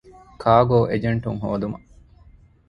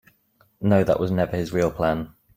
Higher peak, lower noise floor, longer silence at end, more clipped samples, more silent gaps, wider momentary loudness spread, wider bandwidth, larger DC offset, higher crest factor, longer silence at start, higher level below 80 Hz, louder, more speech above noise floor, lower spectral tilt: about the same, -2 dBFS vs -4 dBFS; second, -51 dBFS vs -63 dBFS; first, 0.9 s vs 0.3 s; neither; neither; first, 13 LU vs 6 LU; second, 5.6 kHz vs 16 kHz; neither; about the same, 20 dB vs 18 dB; second, 0.4 s vs 0.6 s; about the same, -46 dBFS vs -48 dBFS; about the same, -21 LUFS vs -23 LUFS; second, 31 dB vs 41 dB; first, -9.5 dB/octave vs -7.5 dB/octave